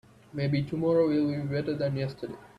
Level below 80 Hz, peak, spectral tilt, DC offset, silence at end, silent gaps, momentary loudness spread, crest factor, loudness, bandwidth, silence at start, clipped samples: -60 dBFS; -14 dBFS; -9 dB/octave; under 0.1%; 0.15 s; none; 11 LU; 14 dB; -28 LUFS; 9.8 kHz; 0.35 s; under 0.1%